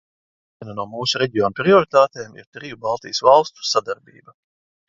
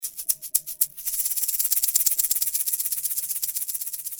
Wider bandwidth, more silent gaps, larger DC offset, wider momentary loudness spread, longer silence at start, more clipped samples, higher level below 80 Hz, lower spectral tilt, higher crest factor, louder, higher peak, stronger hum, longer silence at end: second, 7.8 kHz vs over 20 kHz; first, 2.47-2.52 s vs none; neither; first, 20 LU vs 7 LU; first, 0.6 s vs 0 s; neither; about the same, -60 dBFS vs -64 dBFS; first, -4 dB/octave vs 4 dB/octave; second, 20 dB vs 26 dB; first, -18 LUFS vs -22 LUFS; about the same, 0 dBFS vs 0 dBFS; neither; first, 0.95 s vs 0 s